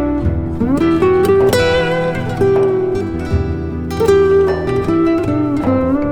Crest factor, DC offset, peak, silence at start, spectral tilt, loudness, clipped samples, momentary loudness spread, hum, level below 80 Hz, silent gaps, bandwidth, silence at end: 12 dB; under 0.1%; -2 dBFS; 0 s; -7 dB/octave; -14 LUFS; under 0.1%; 7 LU; none; -30 dBFS; none; 16 kHz; 0 s